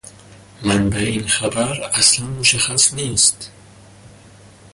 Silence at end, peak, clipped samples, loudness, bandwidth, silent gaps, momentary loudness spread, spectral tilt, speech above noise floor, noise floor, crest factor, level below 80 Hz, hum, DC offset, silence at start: 0.65 s; 0 dBFS; under 0.1%; -16 LUFS; 11.5 kHz; none; 8 LU; -2 dB/octave; 26 dB; -44 dBFS; 18 dB; -42 dBFS; none; under 0.1%; 0.05 s